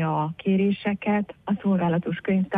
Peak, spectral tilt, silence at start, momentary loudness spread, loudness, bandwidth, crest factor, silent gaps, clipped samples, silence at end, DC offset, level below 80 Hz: -12 dBFS; -10 dB/octave; 0 s; 4 LU; -25 LUFS; 3.9 kHz; 12 dB; none; under 0.1%; 0 s; under 0.1%; -60 dBFS